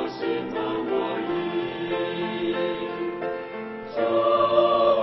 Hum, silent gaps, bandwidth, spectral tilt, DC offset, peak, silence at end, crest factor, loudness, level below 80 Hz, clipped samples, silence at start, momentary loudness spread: none; none; 6 kHz; -8 dB/octave; under 0.1%; -8 dBFS; 0 s; 18 dB; -25 LUFS; -60 dBFS; under 0.1%; 0 s; 11 LU